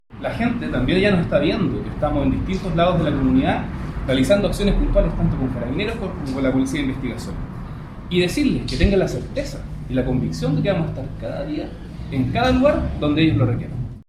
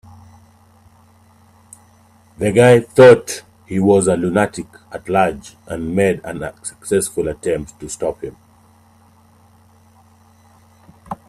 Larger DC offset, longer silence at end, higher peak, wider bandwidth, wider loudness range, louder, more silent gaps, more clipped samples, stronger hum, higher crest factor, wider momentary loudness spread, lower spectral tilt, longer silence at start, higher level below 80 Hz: neither; about the same, 0.05 s vs 0.15 s; about the same, -2 dBFS vs 0 dBFS; about the same, 13.5 kHz vs 14 kHz; second, 4 LU vs 13 LU; second, -21 LUFS vs -16 LUFS; neither; neither; neither; about the same, 18 dB vs 18 dB; second, 11 LU vs 22 LU; first, -7 dB/octave vs -5.5 dB/octave; second, 0.1 s vs 2.4 s; first, -30 dBFS vs -48 dBFS